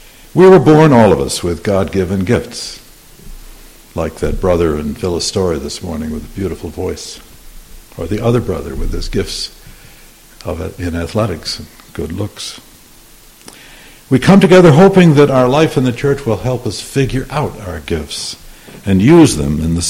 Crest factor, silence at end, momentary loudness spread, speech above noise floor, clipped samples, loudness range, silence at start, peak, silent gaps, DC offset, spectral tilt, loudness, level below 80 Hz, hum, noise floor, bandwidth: 14 dB; 0 s; 19 LU; 29 dB; 0.2%; 12 LU; 0.35 s; 0 dBFS; none; under 0.1%; -6 dB/octave; -13 LUFS; -30 dBFS; none; -41 dBFS; 16.5 kHz